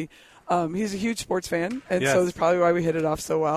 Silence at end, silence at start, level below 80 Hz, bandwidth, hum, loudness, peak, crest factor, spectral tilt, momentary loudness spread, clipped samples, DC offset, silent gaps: 0 s; 0 s; -54 dBFS; 15.5 kHz; none; -24 LUFS; -10 dBFS; 14 dB; -5 dB/octave; 7 LU; under 0.1%; under 0.1%; none